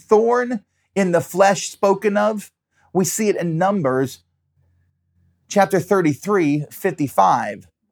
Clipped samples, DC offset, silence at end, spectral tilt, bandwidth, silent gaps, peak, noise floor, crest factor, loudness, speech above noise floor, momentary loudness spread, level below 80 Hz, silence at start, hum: under 0.1%; under 0.1%; 0.3 s; -5.5 dB/octave; over 20 kHz; none; -2 dBFS; -63 dBFS; 18 dB; -19 LUFS; 45 dB; 10 LU; -70 dBFS; 0.1 s; none